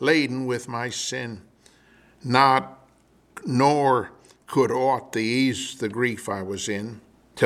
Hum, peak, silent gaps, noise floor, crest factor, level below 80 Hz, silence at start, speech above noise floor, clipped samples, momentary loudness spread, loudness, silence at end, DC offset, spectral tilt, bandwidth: none; -2 dBFS; none; -59 dBFS; 22 dB; -66 dBFS; 0 s; 36 dB; under 0.1%; 17 LU; -23 LUFS; 0 s; under 0.1%; -4.5 dB/octave; 15 kHz